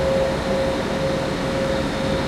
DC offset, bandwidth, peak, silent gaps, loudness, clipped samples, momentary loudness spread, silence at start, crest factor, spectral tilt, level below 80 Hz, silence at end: under 0.1%; 14 kHz; -8 dBFS; none; -22 LUFS; under 0.1%; 2 LU; 0 s; 12 dB; -5.5 dB/octave; -36 dBFS; 0 s